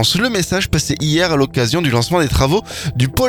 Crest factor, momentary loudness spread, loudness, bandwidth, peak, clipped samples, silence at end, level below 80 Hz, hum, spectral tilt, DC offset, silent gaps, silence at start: 16 dB; 4 LU; -16 LUFS; 19 kHz; 0 dBFS; under 0.1%; 0 s; -30 dBFS; none; -4.5 dB/octave; under 0.1%; none; 0 s